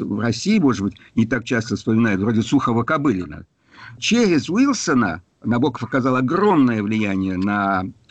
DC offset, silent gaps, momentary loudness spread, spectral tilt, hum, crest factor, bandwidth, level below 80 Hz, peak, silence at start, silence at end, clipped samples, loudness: under 0.1%; none; 7 LU; -5.5 dB/octave; none; 12 dB; 8.6 kHz; -52 dBFS; -8 dBFS; 0 s; 0.2 s; under 0.1%; -19 LUFS